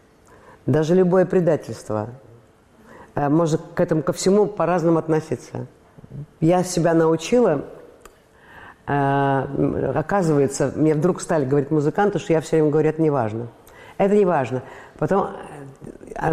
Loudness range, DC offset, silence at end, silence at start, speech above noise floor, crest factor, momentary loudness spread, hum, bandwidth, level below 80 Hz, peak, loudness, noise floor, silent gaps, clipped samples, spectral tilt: 2 LU; under 0.1%; 0 s; 0.65 s; 32 dB; 14 dB; 18 LU; none; 15 kHz; -50 dBFS; -8 dBFS; -20 LUFS; -52 dBFS; none; under 0.1%; -7 dB/octave